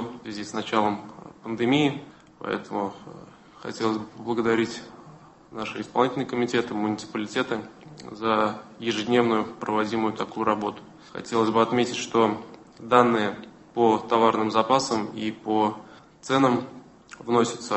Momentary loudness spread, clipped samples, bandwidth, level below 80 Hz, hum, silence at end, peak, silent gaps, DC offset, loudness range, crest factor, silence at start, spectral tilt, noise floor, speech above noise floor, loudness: 19 LU; under 0.1%; 8.6 kHz; -64 dBFS; none; 0 s; -2 dBFS; none; under 0.1%; 6 LU; 24 dB; 0 s; -5 dB/octave; -49 dBFS; 24 dB; -25 LUFS